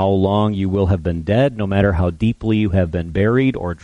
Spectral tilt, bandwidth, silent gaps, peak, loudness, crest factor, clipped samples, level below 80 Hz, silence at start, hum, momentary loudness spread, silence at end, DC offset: -9 dB/octave; 6.8 kHz; none; -2 dBFS; -18 LUFS; 14 dB; under 0.1%; -34 dBFS; 0 s; none; 4 LU; 0.05 s; under 0.1%